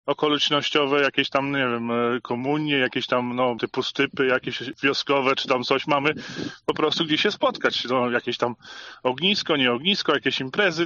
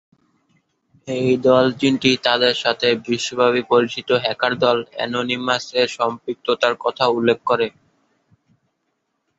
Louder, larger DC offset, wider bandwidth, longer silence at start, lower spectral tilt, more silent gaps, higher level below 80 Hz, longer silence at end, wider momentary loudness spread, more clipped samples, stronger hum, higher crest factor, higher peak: second, -23 LUFS vs -19 LUFS; neither; about the same, 7.4 kHz vs 8 kHz; second, 0.05 s vs 1.05 s; second, -2 dB/octave vs -4.5 dB/octave; neither; second, -66 dBFS vs -60 dBFS; second, 0 s vs 1.7 s; about the same, 7 LU vs 7 LU; neither; neither; about the same, 18 dB vs 18 dB; about the same, -4 dBFS vs -2 dBFS